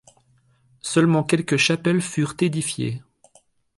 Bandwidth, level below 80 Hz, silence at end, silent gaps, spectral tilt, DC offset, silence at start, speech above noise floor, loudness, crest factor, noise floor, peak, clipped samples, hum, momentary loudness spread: 11.5 kHz; -60 dBFS; 0.8 s; none; -5 dB/octave; under 0.1%; 0.85 s; 40 dB; -21 LUFS; 18 dB; -61 dBFS; -6 dBFS; under 0.1%; none; 10 LU